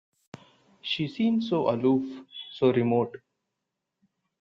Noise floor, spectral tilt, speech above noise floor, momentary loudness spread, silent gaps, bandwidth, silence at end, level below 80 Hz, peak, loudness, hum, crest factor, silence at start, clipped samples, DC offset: -84 dBFS; -7.5 dB/octave; 58 dB; 15 LU; none; 7.2 kHz; 1.25 s; -70 dBFS; -10 dBFS; -26 LUFS; none; 18 dB; 0.35 s; under 0.1%; under 0.1%